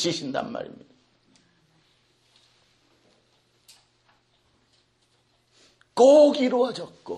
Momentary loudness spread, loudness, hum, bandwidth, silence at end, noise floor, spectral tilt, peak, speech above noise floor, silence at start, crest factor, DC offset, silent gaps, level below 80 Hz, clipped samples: 22 LU; -20 LUFS; none; 11 kHz; 0 s; -67 dBFS; -4.5 dB/octave; -6 dBFS; 46 dB; 0 s; 20 dB; under 0.1%; none; -72 dBFS; under 0.1%